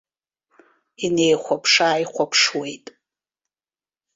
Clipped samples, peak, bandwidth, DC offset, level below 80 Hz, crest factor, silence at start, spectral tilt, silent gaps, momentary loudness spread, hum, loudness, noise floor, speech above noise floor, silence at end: under 0.1%; -4 dBFS; 8 kHz; under 0.1%; -66 dBFS; 20 dB; 1 s; -2.5 dB/octave; none; 13 LU; none; -19 LUFS; under -90 dBFS; over 70 dB; 1.4 s